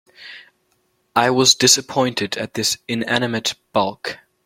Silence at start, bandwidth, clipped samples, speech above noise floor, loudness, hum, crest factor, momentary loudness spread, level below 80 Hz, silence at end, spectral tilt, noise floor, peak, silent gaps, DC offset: 0.2 s; 16.5 kHz; under 0.1%; 47 dB; -17 LUFS; none; 20 dB; 17 LU; -60 dBFS; 0.3 s; -2 dB/octave; -66 dBFS; 0 dBFS; none; under 0.1%